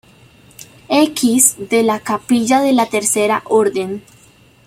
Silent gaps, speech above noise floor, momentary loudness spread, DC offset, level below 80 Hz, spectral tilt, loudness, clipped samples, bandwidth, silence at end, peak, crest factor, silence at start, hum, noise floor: none; 33 dB; 8 LU; under 0.1%; -58 dBFS; -3 dB/octave; -14 LUFS; under 0.1%; 16.5 kHz; 0.65 s; 0 dBFS; 16 dB; 0.9 s; none; -48 dBFS